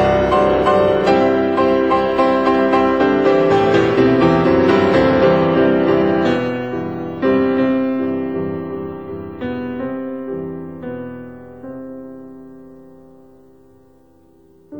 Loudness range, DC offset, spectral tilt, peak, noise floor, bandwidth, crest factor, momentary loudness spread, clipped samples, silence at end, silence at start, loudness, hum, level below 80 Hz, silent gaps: 17 LU; 0.4%; -7.5 dB/octave; -2 dBFS; -50 dBFS; 8.2 kHz; 14 dB; 16 LU; under 0.1%; 0 s; 0 s; -15 LUFS; none; -42 dBFS; none